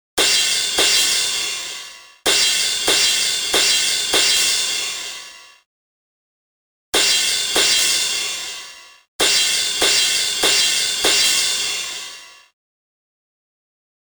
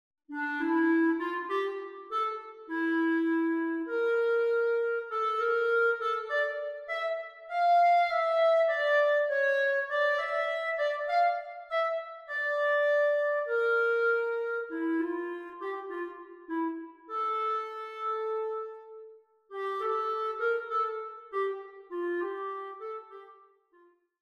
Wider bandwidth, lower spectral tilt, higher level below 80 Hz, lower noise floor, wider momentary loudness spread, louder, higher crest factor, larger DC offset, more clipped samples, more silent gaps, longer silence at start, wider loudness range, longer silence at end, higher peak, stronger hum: first, over 20 kHz vs 8.2 kHz; second, 1.5 dB/octave vs -3 dB/octave; first, -54 dBFS vs -80 dBFS; second, -39 dBFS vs -64 dBFS; about the same, 13 LU vs 13 LU; first, -15 LUFS vs -29 LUFS; first, 20 dB vs 14 dB; neither; neither; first, 5.66-6.93 s, 9.08-9.19 s vs none; second, 0.15 s vs 0.3 s; second, 4 LU vs 8 LU; first, 1.75 s vs 0.9 s; first, 0 dBFS vs -16 dBFS; neither